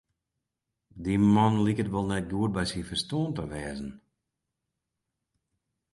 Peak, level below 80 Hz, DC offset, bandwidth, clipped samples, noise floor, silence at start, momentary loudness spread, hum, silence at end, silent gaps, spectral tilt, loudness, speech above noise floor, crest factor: -10 dBFS; -52 dBFS; under 0.1%; 11.5 kHz; under 0.1%; -85 dBFS; 0.95 s; 15 LU; none; 1.95 s; none; -6.5 dB/octave; -28 LUFS; 58 dB; 20 dB